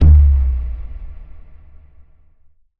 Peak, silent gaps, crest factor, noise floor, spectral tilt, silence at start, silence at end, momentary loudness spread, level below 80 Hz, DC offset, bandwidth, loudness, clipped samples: -2 dBFS; none; 14 dB; -51 dBFS; -11 dB/octave; 0 s; 1.25 s; 25 LU; -18 dBFS; under 0.1%; 1.5 kHz; -15 LUFS; under 0.1%